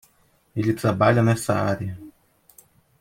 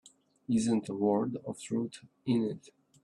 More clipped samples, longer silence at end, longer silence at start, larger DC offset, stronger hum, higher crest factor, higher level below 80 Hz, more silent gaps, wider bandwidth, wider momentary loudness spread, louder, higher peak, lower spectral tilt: neither; first, 0.9 s vs 0.45 s; first, 0.55 s vs 0.05 s; neither; neither; about the same, 20 dB vs 18 dB; first, -56 dBFS vs -72 dBFS; neither; first, 16 kHz vs 11.5 kHz; first, 15 LU vs 12 LU; first, -22 LUFS vs -32 LUFS; first, -4 dBFS vs -16 dBFS; about the same, -6.5 dB/octave vs -6.5 dB/octave